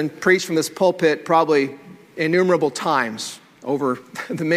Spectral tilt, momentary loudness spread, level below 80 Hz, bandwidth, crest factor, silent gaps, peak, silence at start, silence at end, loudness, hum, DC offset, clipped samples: -5 dB/octave; 13 LU; -68 dBFS; 16 kHz; 18 dB; none; -2 dBFS; 0 s; 0 s; -20 LUFS; none; under 0.1%; under 0.1%